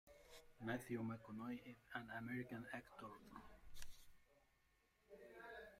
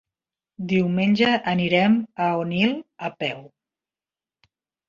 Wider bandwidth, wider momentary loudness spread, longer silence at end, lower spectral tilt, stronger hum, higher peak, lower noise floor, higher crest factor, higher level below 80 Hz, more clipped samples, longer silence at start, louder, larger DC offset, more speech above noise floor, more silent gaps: first, 16 kHz vs 7.2 kHz; first, 16 LU vs 12 LU; second, 0 s vs 1.4 s; about the same, -6 dB/octave vs -7 dB/octave; neither; second, -32 dBFS vs -4 dBFS; second, -80 dBFS vs under -90 dBFS; about the same, 20 dB vs 20 dB; second, -70 dBFS vs -62 dBFS; neither; second, 0.05 s vs 0.6 s; second, -53 LUFS vs -22 LUFS; neither; second, 29 dB vs over 68 dB; neither